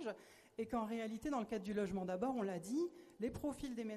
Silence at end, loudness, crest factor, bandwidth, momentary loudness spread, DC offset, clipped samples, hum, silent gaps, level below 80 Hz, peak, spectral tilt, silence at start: 0 s; -43 LUFS; 14 dB; 13.5 kHz; 7 LU; under 0.1%; under 0.1%; none; none; -66 dBFS; -28 dBFS; -6 dB/octave; 0 s